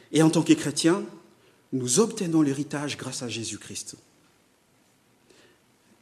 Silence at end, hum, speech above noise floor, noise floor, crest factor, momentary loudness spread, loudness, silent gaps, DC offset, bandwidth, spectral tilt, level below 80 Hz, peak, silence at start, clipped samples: 2.1 s; none; 39 dB; -63 dBFS; 22 dB; 14 LU; -25 LUFS; none; under 0.1%; 13.5 kHz; -4.5 dB/octave; -70 dBFS; -6 dBFS; 0.1 s; under 0.1%